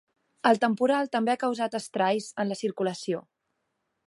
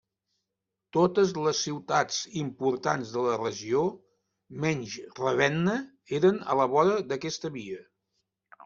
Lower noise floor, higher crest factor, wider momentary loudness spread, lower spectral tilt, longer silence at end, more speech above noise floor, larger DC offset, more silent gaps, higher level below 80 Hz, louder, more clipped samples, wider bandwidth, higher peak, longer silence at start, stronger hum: second, -79 dBFS vs -86 dBFS; about the same, 20 dB vs 20 dB; about the same, 8 LU vs 10 LU; about the same, -5 dB/octave vs -5 dB/octave; first, 0.85 s vs 0 s; second, 52 dB vs 59 dB; neither; neither; second, -80 dBFS vs -68 dBFS; about the same, -27 LUFS vs -28 LUFS; neither; first, 11.5 kHz vs 7.4 kHz; about the same, -8 dBFS vs -8 dBFS; second, 0.45 s vs 0.95 s; neither